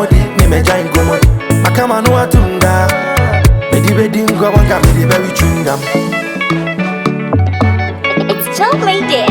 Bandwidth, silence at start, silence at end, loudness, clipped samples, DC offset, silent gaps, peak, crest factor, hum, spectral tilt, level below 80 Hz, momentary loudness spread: over 20 kHz; 0 s; 0 s; -11 LUFS; 0.1%; under 0.1%; none; 0 dBFS; 10 dB; none; -5.5 dB/octave; -18 dBFS; 5 LU